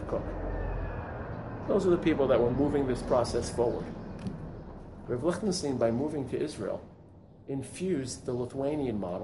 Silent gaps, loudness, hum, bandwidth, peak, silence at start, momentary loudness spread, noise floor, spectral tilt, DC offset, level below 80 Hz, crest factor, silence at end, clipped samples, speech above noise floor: none; -31 LUFS; none; 11.5 kHz; -14 dBFS; 0 s; 14 LU; -53 dBFS; -6.5 dB/octave; under 0.1%; -44 dBFS; 18 dB; 0 s; under 0.1%; 23 dB